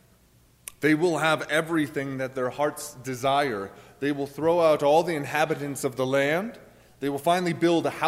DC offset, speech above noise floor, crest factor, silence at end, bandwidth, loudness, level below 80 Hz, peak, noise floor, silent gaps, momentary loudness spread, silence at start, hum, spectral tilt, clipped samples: under 0.1%; 34 dB; 18 dB; 0 s; 16 kHz; -25 LUFS; -64 dBFS; -8 dBFS; -59 dBFS; none; 12 LU; 0.8 s; none; -5 dB/octave; under 0.1%